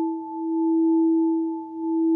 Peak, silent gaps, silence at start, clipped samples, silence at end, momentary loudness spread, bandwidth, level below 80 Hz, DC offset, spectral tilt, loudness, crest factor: -14 dBFS; none; 0 s; under 0.1%; 0 s; 10 LU; 1 kHz; -76 dBFS; under 0.1%; -11.5 dB/octave; -23 LUFS; 8 dB